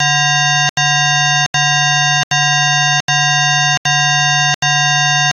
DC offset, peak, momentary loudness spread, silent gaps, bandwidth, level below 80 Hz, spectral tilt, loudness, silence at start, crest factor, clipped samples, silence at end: under 0.1%; 0 dBFS; 1 LU; 0.69-0.76 s, 1.46-1.53 s, 2.23-2.30 s, 3.01-3.08 s, 3.77-3.85 s, 4.55-4.62 s; 8 kHz; -56 dBFS; -1.5 dB/octave; -11 LUFS; 0 s; 14 dB; under 0.1%; 0.05 s